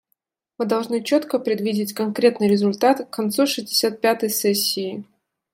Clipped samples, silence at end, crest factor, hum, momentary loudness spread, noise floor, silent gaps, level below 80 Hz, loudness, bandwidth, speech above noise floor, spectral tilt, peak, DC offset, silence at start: under 0.1%; 0.5 s; 18 dB; none; 6 LU; -73 dBFS; none; -70 dBFS; -21 LUFS; 16.5 kHz; 53 dB; -4 dB/octave; -2 dBFS; under 0.1%; 0.6 s